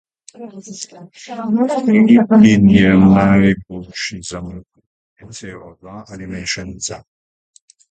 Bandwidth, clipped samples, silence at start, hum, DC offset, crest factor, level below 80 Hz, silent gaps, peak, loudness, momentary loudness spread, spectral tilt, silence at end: 9 kHz; under 0.1%; 0.4 s; none; under 0.1%; 16 dB; -42 dBFS; 4.86-5.16 s; 0 dBFS; -13 LUFS; 25 LU; -6 dB/octave; 0.95 s